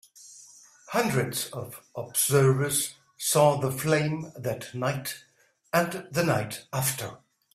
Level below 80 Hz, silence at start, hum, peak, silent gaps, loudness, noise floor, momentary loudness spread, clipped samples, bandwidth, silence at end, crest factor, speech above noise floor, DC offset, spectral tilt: -62 dBFS; 0.15 s; none; -8 dBFS; none; -27 LUFS; -53 dBFS; 16 LU; under 0.1%; 16 kHz; 0.4 s; 20 dB; 26 dB; under 0.1%; -4.5 dB/octave